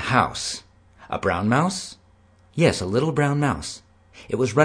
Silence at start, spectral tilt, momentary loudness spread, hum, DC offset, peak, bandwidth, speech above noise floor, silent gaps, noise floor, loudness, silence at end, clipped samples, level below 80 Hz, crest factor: 0 s; -5.5 dB/octave; 14 LU; none; under 0.1%; -2 dBFS; 10.5 kHz; 34 dB; none; -55 dBFS; -23 LUFS; 0 s; under 0.1%; -50 dBFS; 20 dB